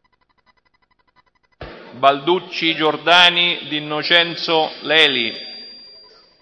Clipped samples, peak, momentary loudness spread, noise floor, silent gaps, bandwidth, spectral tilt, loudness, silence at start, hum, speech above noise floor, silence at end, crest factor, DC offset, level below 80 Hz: under 0.1%; 0 dBFS; 21 LU; -62 dBFS; none; 10.5 kHz; -3.5 dB/octave; -15 LUFS; 1.6 s; none; 45 dB; 0.55 s; 20 dB; under 0.1%; -58 dBFS